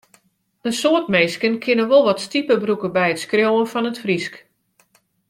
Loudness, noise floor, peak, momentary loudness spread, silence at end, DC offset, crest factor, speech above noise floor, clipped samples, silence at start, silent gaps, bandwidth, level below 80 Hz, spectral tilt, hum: -18 LUFS; -62 dBFS; -2 dBFS; 8 LU; 0.95 s; under 0.1%; 18 dB; 43 dB; under 0.1%; 0.65 s; none; 15.5 kHz; -64 dBFS; -4.5 dB/octave; none